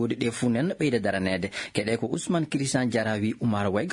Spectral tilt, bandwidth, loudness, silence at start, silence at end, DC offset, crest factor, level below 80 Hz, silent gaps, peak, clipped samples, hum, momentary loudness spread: -5.5 dB/octave; 11 kHz; -27 LUFS; 0 s; 0 s; under 0.1%; 18 dB; -62 dBFS; none; -8 dBFS; under 0.1%; none; 3 LU